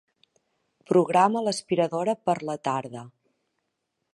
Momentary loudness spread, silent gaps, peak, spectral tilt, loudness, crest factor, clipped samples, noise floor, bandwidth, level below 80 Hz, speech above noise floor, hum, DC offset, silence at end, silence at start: 10 LU; none; -6 dBFS; -5.5 dB/octave; -25 LUFS; 20 dB; under 0.1%; -79 dBFS; 11.5 kHz; -76 dBFS; 55 dB; none; under 0.1%; 1.05 s; 0.9 s